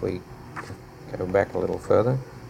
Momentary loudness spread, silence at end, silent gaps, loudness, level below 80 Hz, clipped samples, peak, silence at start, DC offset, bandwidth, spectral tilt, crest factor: 17 LU; 0 s; none; -25 LUFS; -50 dBFS; under 0.1%; -6 dBFS; 0 s; under 0.1%; 15 kHz; -8 dB/octave; 20 dB